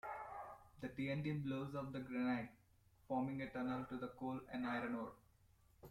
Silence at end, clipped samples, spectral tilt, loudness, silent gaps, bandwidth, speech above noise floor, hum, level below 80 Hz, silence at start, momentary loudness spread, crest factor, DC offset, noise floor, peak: 0 s; under 0.1%; -8 dB/octave; -45 LUFS; none; 14 kHz; 28 dB; none; -72 dBFS; 0.05 s; 11 LU; 16 dB; under 0.1%; -72 dBFS; -30 dBFS